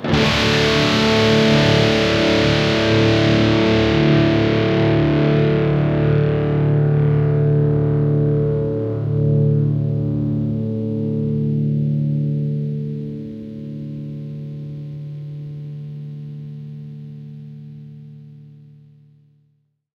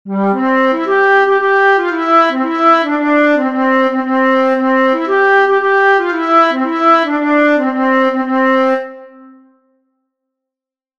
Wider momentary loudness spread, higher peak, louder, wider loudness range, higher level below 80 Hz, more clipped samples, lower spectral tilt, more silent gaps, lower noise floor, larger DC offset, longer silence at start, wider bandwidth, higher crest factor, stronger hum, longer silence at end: first, 17 LU vs 3 LU; second, -4 dBFS vs 0 dBFS; second, -17 LUFS vs -12 LUFS; first, 18 LU vs 4 LU; first, -38 dBFS vs -64 dBFS; neither; about the same, -6.5 dB/octave vs -6 dB/octave; neither; second, -64 dBFS vs -87 dBFS; neither; about the same, 0 s vs 0.05 s; first, 8.2 kHz vs 7.4 kHz; about the same, 14 dB vs 12 dB; neither; second, 1.5 s vs 1.9 s